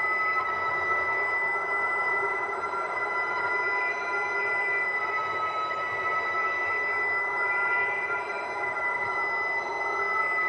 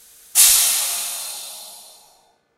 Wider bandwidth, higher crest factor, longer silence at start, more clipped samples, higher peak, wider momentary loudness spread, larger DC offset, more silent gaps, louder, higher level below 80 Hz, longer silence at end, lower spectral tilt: second, 10.5 kHz vs 16 kHz; second, 14 dB vs 22 dB; second, 0 s vs 0.35 s; neither; second, -14 dBFS vs 0 dBFS; second, 4 LU vs 21 LU; neither; neither; second, -26 LUFS vs -15 LUFS; second, -68 dBFS vs -56 dBFS; second, 0 s vs 0.75 s; first, -3.5 dB/octave vs 4.5 dB/octave